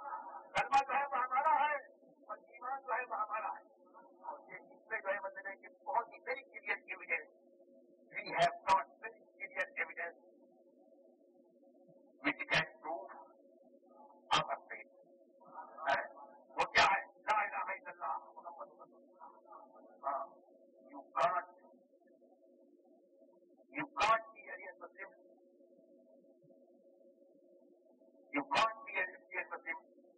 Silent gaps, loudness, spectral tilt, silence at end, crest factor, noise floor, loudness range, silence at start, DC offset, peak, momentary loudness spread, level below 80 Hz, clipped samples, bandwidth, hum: none; -37 LUFS; 0 dB/octave; 0.4 s; 24 dB; -67 dBFS; 8 LU; 0 s; under 0.1%; -16 dBFS; 20 LU; -76 dBFS; under 0.1%; 4.5 kHz; none